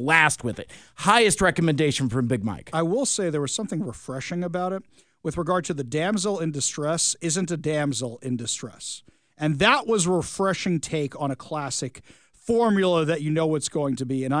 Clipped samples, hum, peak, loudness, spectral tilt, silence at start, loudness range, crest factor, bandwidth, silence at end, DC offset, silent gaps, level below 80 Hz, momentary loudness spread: under 0.1%; none; -2 dBFS; -24 LUFS; -4 dB/octave; 0 s; 5 LU; 22 dB; 10.5 kHz; 0 s; under 0.1%; none; -54 dBFS; 12 LU